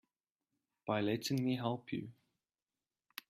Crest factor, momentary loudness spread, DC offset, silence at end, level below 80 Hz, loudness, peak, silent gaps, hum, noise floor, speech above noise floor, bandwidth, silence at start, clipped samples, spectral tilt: 20 dB; 15 LU; under 0.1%; 1.2 s; -78 dBFS; -38 LUFS; -22 dBFS; none; none; under -90 dBFS; over 53 dB; 15.5 kHz; 0.85 s; under 0.1%; -5.5 dB/octave